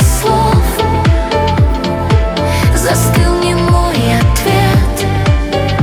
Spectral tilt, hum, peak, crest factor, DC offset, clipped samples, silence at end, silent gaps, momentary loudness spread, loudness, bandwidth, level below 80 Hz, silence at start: -5.5 dB/octave; none; 0 dBFS; 10 dB; under 0.1%; under 0.1%; 0 s; none; 3 LU; -12 LUFS; 19 kHz; -16 dBFS; 0 s